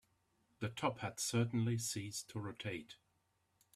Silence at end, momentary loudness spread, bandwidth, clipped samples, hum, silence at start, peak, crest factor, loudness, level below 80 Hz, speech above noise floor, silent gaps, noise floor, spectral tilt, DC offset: 0.8 s; 11 LU; 15 kHz; under 0.1%; none; 0.6 s; -22 dBFS; 20 dB; -40 LUFS; -74 dBFS; 40 dB; none; -80 dBFS; -4.5 dB/octave; under 0.1%